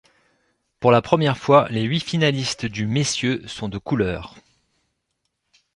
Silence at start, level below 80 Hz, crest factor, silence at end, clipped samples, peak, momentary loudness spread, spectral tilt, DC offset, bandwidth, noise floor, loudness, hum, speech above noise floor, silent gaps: 0.8 s; -50 dBFS; 22 dB; 1.45 s; under 0.1%; 0 dBFS; 11 LU; -5 dB/octave; under 0.1%; 11.5 kHz; -75 dBFS; -20 LUFS; none; 55 dB; none